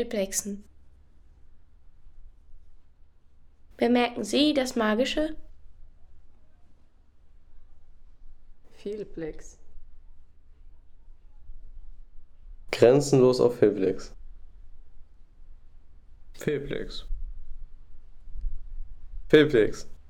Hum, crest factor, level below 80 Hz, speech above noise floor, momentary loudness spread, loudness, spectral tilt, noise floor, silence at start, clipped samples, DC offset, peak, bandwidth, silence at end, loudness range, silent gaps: none; 22 dB; -44 dBFS; 30 dB; 27 LU; -25 LUFS; -5 dB/octave; -53 dBFS; 0 s; under 0.1%; under 0.1%; -6 dBFS; 16.5 kHz; 0 s; 19 LU; none